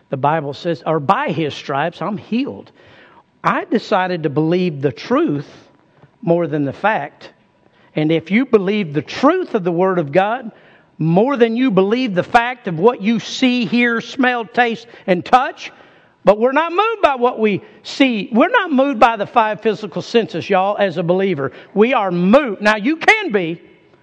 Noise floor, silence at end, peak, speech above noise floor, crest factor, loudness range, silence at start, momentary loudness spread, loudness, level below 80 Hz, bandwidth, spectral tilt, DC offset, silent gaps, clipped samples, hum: -54 dBFS; 0.45 s; 0 dBFS; 37 dB; 16 dB; 5 LU; 0.1 s; 9 LU; -16 LUFS; -56 dBFS; 9.2 kHz; -6.5 dB/octave; under 0.1%; none; under 0.1%; none